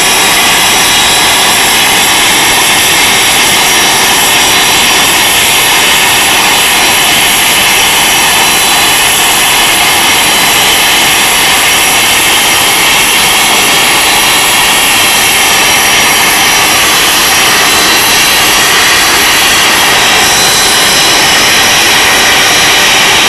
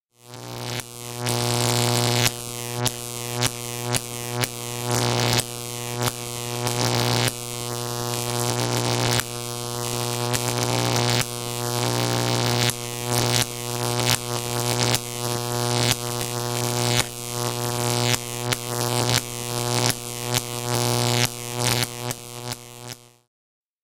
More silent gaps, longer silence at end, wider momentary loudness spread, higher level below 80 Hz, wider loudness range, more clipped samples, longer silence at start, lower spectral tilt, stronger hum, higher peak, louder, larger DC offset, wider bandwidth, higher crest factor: neither; second, 0 s vs 0.8 s; second, 0 LU vs 9 LU; first, -34 dBFS vs -50 dBFS; about the same, 0 LU vs 2 LU; neither; second, 0 s vs 0.25 s; second, 0 dB/octave vs -3.5 dB/octave; neither; first, 0 dBFS vs -4 dBFS; first, -3 LUFS vs -23 LUFS; second, under 0.1% vs 0.2%; second, 12 kHz vs 17 kHz; second, 6 dB vs 22 dB